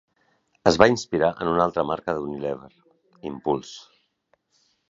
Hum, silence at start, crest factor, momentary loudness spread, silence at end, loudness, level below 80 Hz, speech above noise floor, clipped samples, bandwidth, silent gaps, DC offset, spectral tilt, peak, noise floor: none; 0.65 s; 24 dB; 18 LU; 1.1 s; -23 LUFS; -54 dBFS; 46 dB; under 0.1%; 8 kHz; none; under 0.1%; -5 dB/octave; 0 dBFS; -69 dBFS